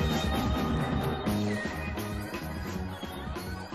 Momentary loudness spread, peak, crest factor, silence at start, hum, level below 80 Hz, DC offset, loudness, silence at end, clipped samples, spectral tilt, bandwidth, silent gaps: 8 LU; -16 dBFS; 14 dB; 0 s; none; -40 dBFS; under 0.1%; -32 LUFS; 0 s; under 0.1%; -6 dB/octave; 13 kHz; none